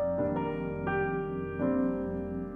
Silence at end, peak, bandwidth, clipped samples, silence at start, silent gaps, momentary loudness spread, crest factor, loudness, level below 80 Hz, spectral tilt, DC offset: 0 s; -18 dBFS; 3.5 kHz; under 0.1%; 0 s; none; 5 LU; 14 dB; -32 LUFS; -52 dBFS; -10.5 dB/octave; under 0.1%